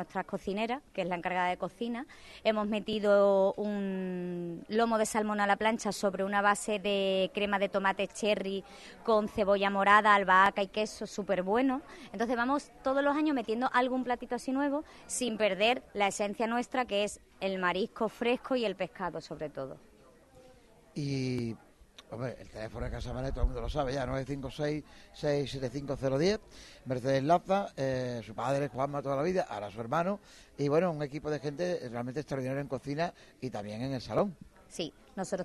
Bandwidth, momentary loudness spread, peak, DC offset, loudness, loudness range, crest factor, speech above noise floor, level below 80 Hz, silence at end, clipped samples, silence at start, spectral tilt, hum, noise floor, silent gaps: 12 kHz; 12 LU; -8 dBFS; under 0.1%; -31 LUFS; 9 LU; 24 dB; 27 dB; -50 dBFS; 0 s; under 0.1%; 0 s; -5 dB/octave; none; -59 dBFS; none